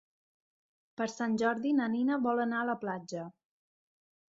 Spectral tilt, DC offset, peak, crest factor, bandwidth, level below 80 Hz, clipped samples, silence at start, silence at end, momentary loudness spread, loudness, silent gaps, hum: -5.5 dB/octave; under 0.1%; -16 dBFS; 20 dB; 7.8 kHz; -80 dBFS; under 0.1%; 1 s; 1.05 s; 13 LU; -32 LUFS; none; none